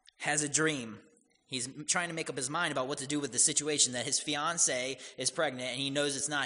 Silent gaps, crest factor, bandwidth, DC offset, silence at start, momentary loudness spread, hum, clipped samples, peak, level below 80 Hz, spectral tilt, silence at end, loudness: none; 22 dB; 11 kHz; under 0.1%; 0.2 s; 10 LU; none; under 0.1%; -10 dBFS; -74 dBFS; -1.5 dB/octave; 0 s; -31 LUFS